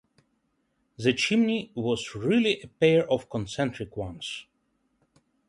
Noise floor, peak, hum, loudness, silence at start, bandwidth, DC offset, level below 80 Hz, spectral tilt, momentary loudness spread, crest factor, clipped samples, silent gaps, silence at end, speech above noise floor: -73 dBFS; -8 dBFS; none; -26 LUFS; 1 s; 11.5 kHz; under 0.1%; -58 dBFS; -5.5 dB/octave; 13 LU; 20 dB; under 0.1%; none; 1.05 s; 47 dB